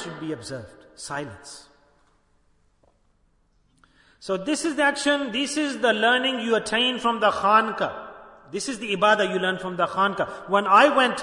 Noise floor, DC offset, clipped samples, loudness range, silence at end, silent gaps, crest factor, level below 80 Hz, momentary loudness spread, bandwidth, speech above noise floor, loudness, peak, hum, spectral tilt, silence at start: -64 dBFS; under 0.1%; under 0.1%; 17 LU; 0 s; none; 22 dB; -64 dBFS; 18 LU; 11 kHz; 41 dB; -22 LUFS; -2 dBFS; none; -3 dB/octave; 0 s